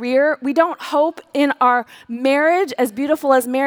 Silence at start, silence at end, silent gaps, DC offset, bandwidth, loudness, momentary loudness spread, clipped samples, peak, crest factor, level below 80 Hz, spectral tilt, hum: 0 s; 0 s; none; under 0.1%; over 20 kHz; -17 LUFS; 5 LU; under 0.1%; -2 dBFS; 16 dB; -68 dBFS; -3.5 dB/octave; none